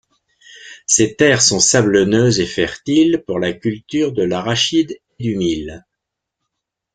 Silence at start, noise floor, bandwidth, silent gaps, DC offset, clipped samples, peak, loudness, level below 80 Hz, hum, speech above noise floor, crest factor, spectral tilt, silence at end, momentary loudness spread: 0.55 s; -80 dBFS; 9.6 kHz; none; under 0.1%; under 0.1%; 0 dBFS; -15 LUFS; -50 dBFS; none; 64 dB; 18 dB; -3.5 dB/octave; 1.15 s; 12 LU